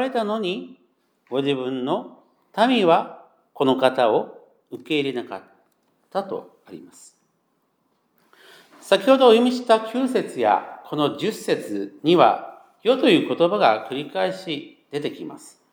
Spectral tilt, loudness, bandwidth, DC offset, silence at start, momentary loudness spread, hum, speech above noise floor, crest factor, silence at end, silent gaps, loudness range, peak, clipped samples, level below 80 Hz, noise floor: -5.5 dB/octave; -21 LUFS; 20 kHz; under 0.1%; 0 s; 17 LU; none; 48 dB; 20 dB; 0.25 s; none; 11 LU; -2 dBFS; under 0.1%; -84 dBFS; -69 dBFS